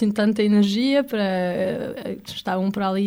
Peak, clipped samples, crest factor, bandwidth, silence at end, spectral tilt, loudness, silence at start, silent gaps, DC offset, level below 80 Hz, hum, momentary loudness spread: -8 dBFS; under 0.1%; 14 dB; 14.5 kHz; 0 s; -6.5 dB/octave; -22 LUFS; 0 s; none; under 0.1%; -58 dBFS; none; 12 LU